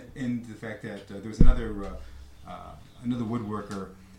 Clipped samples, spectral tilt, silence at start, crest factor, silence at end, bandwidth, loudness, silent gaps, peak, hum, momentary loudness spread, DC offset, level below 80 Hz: under 0.1%; -7.5 dB/octave; 0 s; 24 dB; 0.25 s; 8.2 kHz; -32 LUFS; none; -2 dBFS; none; 20 LU; under 0.1%; -28 dBFS